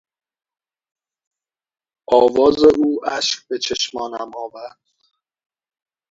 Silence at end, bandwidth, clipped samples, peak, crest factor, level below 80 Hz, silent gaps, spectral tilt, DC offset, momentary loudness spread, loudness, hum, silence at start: 1.4 s; 7.8 kHz; under 0.1%; 0 dBFS; 20 dB; -54 dBFS; none; -3 dB/octave; under 0.1%; 19 LU; -17 LUFS; none; 2.1 s